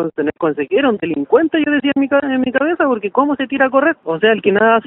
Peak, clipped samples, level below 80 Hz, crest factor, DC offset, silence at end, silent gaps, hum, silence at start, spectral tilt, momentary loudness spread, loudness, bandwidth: 0 dBFS; under 0.1%; -56 dBFS; 14 dB; under 0.1%; 0.05 s; none; none; 0 s; -3 dB/octave; 5 LU; -15 LUFS; 3.9 kHz